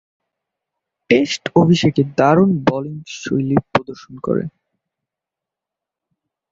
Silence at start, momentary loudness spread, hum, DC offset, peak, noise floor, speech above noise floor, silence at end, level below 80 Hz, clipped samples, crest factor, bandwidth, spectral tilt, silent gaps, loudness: 1.1 s; 15 LU; none; under 0.1%; -2 dBFS; -85 dBFS; 69 dB; 2 s; -52 dBFS; under 0.1%; 18 dB; 7.8 kHz; -6.5 dB/octave; none; -17 LUFS